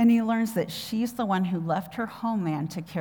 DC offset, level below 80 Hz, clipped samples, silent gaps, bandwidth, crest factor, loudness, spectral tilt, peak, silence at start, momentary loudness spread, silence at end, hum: under 0.1%; -66 dBFS; under 0.1%; none; over 20 kHz; 14 dB; -28 LUFS; -6.5 dB/octave; -12 dBFS; 0 s; 7 LU; 0 s; none